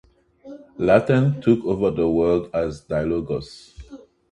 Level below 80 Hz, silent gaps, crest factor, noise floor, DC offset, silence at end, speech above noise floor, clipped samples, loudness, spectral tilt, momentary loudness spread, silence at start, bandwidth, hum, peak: -46 dBFS; none; 20 dB; -44 dBFS; under 0.1%; 0.35 s; 24 dB; under 0.1%; -21 LUFS; -8.5 dB/octave; 12 LU; 0.45 s; 11 kHz; none; -2 dBFS